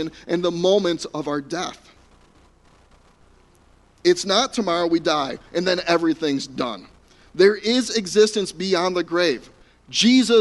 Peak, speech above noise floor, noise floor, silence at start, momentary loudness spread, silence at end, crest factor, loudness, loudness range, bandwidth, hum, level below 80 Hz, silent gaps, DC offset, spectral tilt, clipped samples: -2 dBFS; 35 dB; -55 dBFS; 0 s; 10 LU; 0 s; 20 dB; -21 LUFS; 6 LU; 11.5 kHz; none; -56 dBFS; none; under 0.1%; -4 dB/octave; under 0.1%